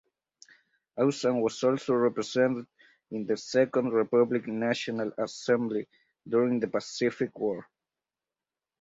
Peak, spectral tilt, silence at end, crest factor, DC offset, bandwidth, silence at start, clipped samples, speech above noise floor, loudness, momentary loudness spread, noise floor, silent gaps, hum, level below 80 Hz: -12 dBFS; -5.5 dB/octave; 1.2 s; 18 dB; under 0.1%; 8 kHz; 0.95 s; under 0.1%; over 62 dB; -28 LUFS; 9 LU; under -90 dBFS; none; none; -74 dBFS